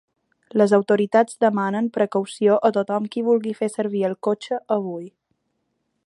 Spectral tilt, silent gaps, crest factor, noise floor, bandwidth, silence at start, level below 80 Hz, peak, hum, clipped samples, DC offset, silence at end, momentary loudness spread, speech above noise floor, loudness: -6.5 dB/octave; none; 18 dB; -73 dBFS; 11.5 kHz; 0.55 s; -74 dBFS; -4 dBFS; none; under 0.1%; under 0.1%; 1 s; 8 LU; 53 dB; -21 LUFS